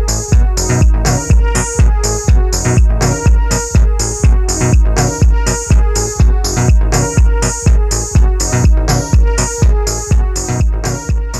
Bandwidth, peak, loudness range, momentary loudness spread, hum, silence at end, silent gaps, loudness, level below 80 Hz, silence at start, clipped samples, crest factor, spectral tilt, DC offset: 13 kHz; 0 dBFS; 1 LU; 3 LU; none; 0 s; none; -13 LUFS; -12 dBFS; 0 s; under 0.1%; 10 dB; -5 dB/octave; under 0.1%